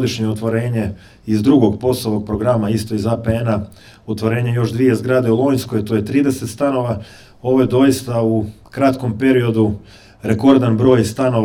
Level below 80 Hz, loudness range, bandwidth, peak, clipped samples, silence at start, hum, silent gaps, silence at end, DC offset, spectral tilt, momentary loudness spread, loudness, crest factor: -44 dBFS; 2 LU; 16.5 kHz; 0 dBFS; under 0.1%; 0 s; none; none; 0 s; under 0.1%; -7 dB/octave; 10 LU; -16 LUFS; 16 dB